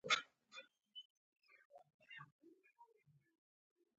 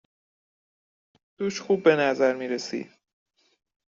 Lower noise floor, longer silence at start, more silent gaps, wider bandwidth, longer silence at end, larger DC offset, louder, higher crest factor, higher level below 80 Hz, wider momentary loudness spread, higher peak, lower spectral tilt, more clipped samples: second, -75 dBFS vs under -90 dBFS; second, 0.05 s vs 1.4 s; first, 1.05-1.32 s, 1.65-1.70 s, 1.94-1.99 s, 2.32-2.39 s vs none; about the same, 7.6 kHz vs 7.6 kHz; about the same, 1.15 s vs 1.05 s; neither; second, -47 LUFS vs -25 LUFS; first, 30 dB vs 22 dB; second, under -90 dBFS vs -74 dBFS; first, 28 LU vs 14 LU; second, -22 dBFS vs -6 dBFS; second, 2 dB/octave vs -3.5 dB/octave; neither